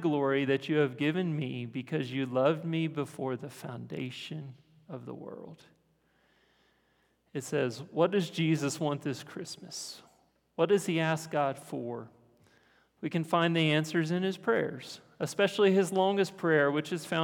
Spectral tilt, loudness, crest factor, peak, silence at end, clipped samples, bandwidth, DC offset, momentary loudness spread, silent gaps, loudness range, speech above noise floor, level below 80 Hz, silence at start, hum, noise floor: -5.5 dB/octave; -31 LUFS; 18 dB; -12 dBFS; 0 s; under 0.1%; 18 kHz; under 0.1%; 17 LU; none; 13 LU; 41 dB; -80 dBFS; 0 s; none; -71 dBFS